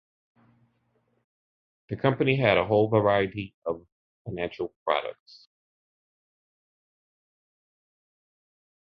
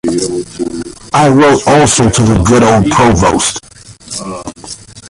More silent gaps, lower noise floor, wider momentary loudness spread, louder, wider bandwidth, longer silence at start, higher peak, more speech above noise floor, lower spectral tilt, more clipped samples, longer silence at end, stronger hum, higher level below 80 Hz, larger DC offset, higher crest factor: first, 3.54-3.62 s, 3.92-4.25 s, 4.76-4.86 s vs none; first, -71 dBFS vs -30 dBFS; about the same, 17 LU vs 17 LU; second, -26 LUFS vs -9 LUFS; second, 6 kHz vs 11.5 kHz; first, 1.9 s vs 0.05 s; second, -6 dBFS vs 0 dBFS; first, 46 dB vs 22 dB; first, -9 dB/octave vs -4.5 dB/octave; neither; first, 3.7 s vs 0 s; neither; second, -60 dBFS vs -28 dBFS; neither; first, 24 dB vs 10 dB